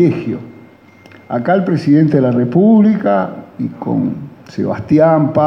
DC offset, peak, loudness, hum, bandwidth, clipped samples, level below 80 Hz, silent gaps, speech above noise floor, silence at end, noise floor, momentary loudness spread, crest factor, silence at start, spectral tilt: under 0.1%; 0 dBFS; -14 LUFS; none; 6.2 kHz; under 0.1%; -54 dBFS; none; 29 dB; 0 s; -42 dBFS; 14 LU; 12 dB; 0 s; -10 dB/octave